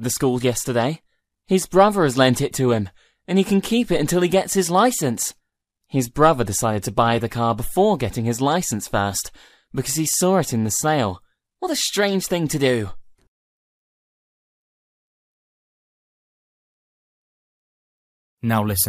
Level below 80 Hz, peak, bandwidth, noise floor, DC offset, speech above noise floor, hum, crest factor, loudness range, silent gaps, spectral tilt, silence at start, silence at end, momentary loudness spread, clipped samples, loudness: -46 dBFS; -2 dBFS; 15.5 kHz; -76 dBFS; under 0.1%; 56 dB; none; 20 dB; 5 LU; 13.28-18.37 s; -4.5 dB/octave; 0 s; 0 s; 9 LU; under 0.1%; -20 LUFS